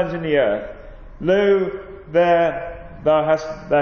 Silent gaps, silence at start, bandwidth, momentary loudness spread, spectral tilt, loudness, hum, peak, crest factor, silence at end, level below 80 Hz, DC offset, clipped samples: none; 0 s; 6.8 kHz; 13 LU; -7 dB/octave; -19 LUFS; none; -6 dBFS; 14 dB; 0 s; -44 dBFS; under 0.1%; under 0.1%